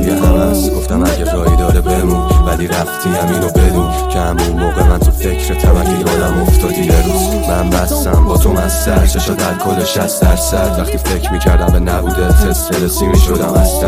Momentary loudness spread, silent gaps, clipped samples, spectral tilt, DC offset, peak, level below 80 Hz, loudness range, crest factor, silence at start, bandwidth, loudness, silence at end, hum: 4 LU; none; under 0.1%; -5.5 dB/octave; under 0.1%; 0 dBFS; -14 dBFS; 1 LU; 10 dB; 0 s; 16.5 kHz; -13 LUFS; 0 s; none